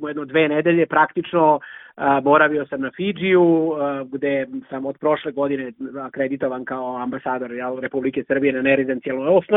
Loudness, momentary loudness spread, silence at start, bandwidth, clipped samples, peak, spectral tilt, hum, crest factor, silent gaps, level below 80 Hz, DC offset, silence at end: -20 LUFS; 11 LU; 0 s; 3.9 kHz; under 0.1%; -2 dBFS; -9.5 dB/octave; none; 18 dB; none; -62 dBFS; under 0.1%; 0 s